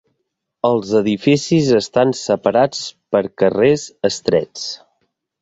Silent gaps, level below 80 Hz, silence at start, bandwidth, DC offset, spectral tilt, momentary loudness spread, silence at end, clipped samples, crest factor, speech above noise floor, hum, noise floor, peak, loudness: none; -54 dBFS; 0.65 s; 8 kHz; under 0.1%; -5.5 dB/octave; 10 LU; 0.65 s; under 0.1%; 16 dB; 58 dB; none; -74 dBFS; -2 dBFS; -17 LUFS